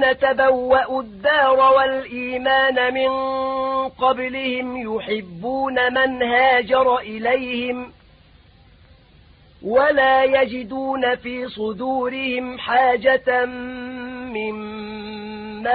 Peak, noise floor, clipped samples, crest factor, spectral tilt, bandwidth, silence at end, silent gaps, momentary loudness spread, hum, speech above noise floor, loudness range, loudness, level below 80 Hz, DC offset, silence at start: -4 dBFS; -50 dBFS; under 0.1%; 16 dB; -9 dB/octave; 4.8 kHz; 0 s; none; 15 LU; none; 31 dB; 4 LU; -19 LUFS; -52 dBFS; under 0.1%; 0 s